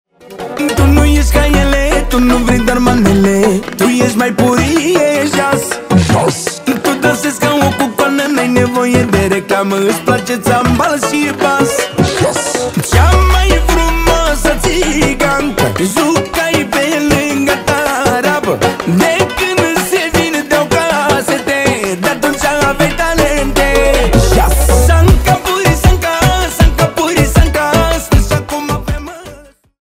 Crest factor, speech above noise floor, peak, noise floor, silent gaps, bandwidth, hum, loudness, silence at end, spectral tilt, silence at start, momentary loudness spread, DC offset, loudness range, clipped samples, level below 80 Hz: 10 dB; 26 dB; 0 dBFS; -37 dBFS; none; 16.5 kHz; none; -11 LUFS; 0.45 s; -5 dB/octave; 0.3 s; 4 LU; under 0.1%; 2 LU; under 0.1%; -18 dBFS